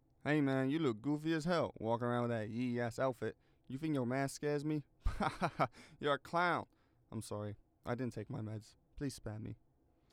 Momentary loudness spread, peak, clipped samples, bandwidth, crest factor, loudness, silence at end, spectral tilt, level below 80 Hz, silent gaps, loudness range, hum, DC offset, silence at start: 13 LU; -20 dBFS; under 0.1%; 16 kHz; 18 dB; -39 LUFS; 0.6 s; -6.5 dB/octave; -54 dBFS; none; 5 LU; none; under 0.1%; 0.25 s